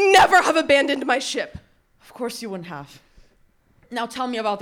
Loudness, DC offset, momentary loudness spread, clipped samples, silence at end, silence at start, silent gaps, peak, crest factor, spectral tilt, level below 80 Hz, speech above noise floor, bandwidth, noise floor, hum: -20 LUFS; under 0.1%; 19 LU; under 0.1%; 0 s; 0 s; none; -2 dBFS; 20 dB; -2.5 dB/octave; -56 dBFS; 38 dB; 19.5 kHz; -59 dBFS; none